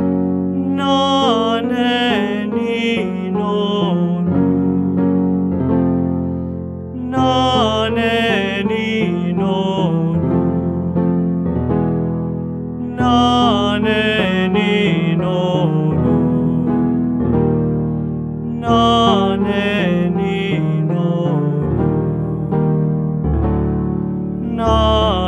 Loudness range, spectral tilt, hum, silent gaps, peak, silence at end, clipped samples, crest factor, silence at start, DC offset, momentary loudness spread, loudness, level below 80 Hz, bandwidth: 2 LU; -7 dB/octave; none; none; 0 dBFS; 0 s; under 0.1%; 16 dB; 0 s; under 0.1%; 7 LU; -17 LUFS; -34 dBFS; 8.8 kHz